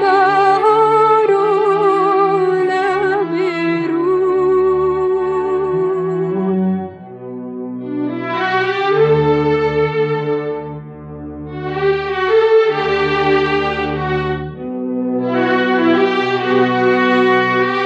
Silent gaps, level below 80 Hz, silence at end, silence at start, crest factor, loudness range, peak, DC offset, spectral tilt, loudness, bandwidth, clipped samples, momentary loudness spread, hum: none; -44 dBFS; 0 s; 0 s; 12 dB; 4 LU; -2 dBFS; under 0.1%; -7 dB/octave; -15 LUFS; 8.2 kHz; under 0.1%; 13 LU; none